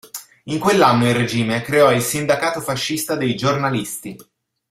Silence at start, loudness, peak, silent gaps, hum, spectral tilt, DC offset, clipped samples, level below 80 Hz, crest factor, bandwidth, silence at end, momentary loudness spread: 0.05 s; -18 LUFS; -2 dBFS; none; none; -4.5 dB/octave; under 0.1%; under 0.1%; -54 dBFS; 16 dB; 16 kHz; 0.5 s; 14 LU